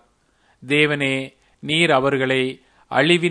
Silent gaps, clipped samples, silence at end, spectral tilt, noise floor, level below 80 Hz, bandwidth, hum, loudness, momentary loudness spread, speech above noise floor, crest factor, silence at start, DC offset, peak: none; under 0.1%; 0 s; -5 dB/octave; -61 dBFS; -60 dBFS; 10.5 kHz; none; -19 LUFS; 10 LU; 42 dB; 20 dB; 0.6 s; under 0.1%; 0 dBFS